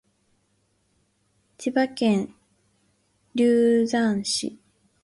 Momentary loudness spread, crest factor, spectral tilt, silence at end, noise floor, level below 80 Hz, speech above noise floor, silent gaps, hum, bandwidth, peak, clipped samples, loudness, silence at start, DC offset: 13 LU; 16 dB; -4.5 dB/octave; 0.5 s; -69 dBFS; -66 dBFS; 47 dB; none; none; 11.5 kHz; -10 dBFS; under 0.1%; -23 LUFS; 1.6 s; under 0.1%